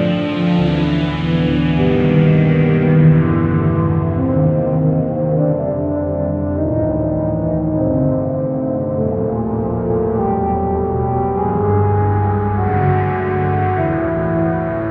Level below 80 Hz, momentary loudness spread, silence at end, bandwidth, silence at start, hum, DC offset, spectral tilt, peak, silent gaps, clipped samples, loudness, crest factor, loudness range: -34 dBFS; 6 LU; 0 s; 4.7 kHz; 0 s; none; under 0.1%; -10.5 dB/octave; 0 dBFS; none; under 0.1%; -16 LUFS; 14 dB; 4 LU